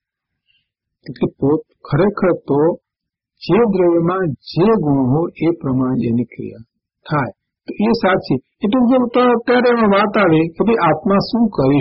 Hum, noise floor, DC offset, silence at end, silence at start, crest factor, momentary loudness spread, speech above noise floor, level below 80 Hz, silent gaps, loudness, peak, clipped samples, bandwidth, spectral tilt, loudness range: none; -82 dBFS; under 0.1%; 0 s; 1.05 s; 12 dB; 10 LU; 67 dB; -46 dBFS; none; -16 LUFS; -4 dBFS; under 0.1%; 5.8 kHz; -6 dB/octave; 5 LU